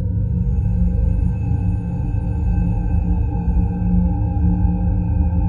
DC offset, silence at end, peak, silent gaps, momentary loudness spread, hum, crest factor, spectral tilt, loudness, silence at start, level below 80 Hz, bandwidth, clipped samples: under 0.1%; 0 s; -6 dBFS; none; 3 LU; none; 12 dB; -12 dB/octave; -20 LUFS; 0 s; -20 dBFS; 2.8 kHz; under 0.1%